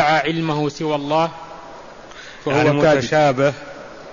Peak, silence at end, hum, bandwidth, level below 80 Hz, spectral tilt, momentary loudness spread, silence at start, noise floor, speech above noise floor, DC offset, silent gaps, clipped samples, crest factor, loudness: -4 dBFS; 0 s; none; 7.4 kHz; -50 dBFS; -6 dB/octave; 22 LU; 0 s; -38 dBFS; 21 dB; 0.2%; none; under 0.1%; 14 dB; -18 LUFS